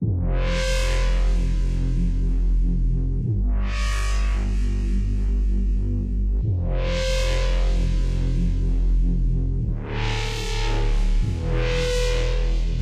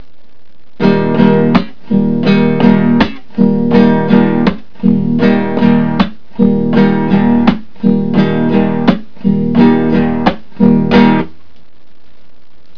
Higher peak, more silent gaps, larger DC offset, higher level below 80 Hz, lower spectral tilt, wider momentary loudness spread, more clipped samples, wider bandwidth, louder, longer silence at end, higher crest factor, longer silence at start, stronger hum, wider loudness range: second, -12 dBFS vs 0 dBFS; neither; second, under 0.1% vs 8%; first, -22 dBFS vs -38 dBFS; second, -5.5 dB/octave vs -9 dB/octave; second, 2 LU vs 7 LU; second, under 0.1% vs 0.4%; first, 9.8 kHz vs 5.4 kHz; second, -25 LUFS vs -11 LUFS; second, 0 s vs 1.5 s; about the same, 10 dB vs 12 dB; second, 0 s vs 0.8 s; neither; about the same, 1 LU vs 1 LU